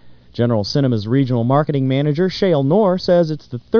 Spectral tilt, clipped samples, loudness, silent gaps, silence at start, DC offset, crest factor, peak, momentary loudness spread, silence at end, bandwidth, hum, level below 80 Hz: -8 dB/octave; under 0.1%; -17 LUFS; none; 0.35 s; 0.5%; 14 dB; -2 dBFS; 6 LU; 0 s; 5.4 kHz; none; -50 dBFS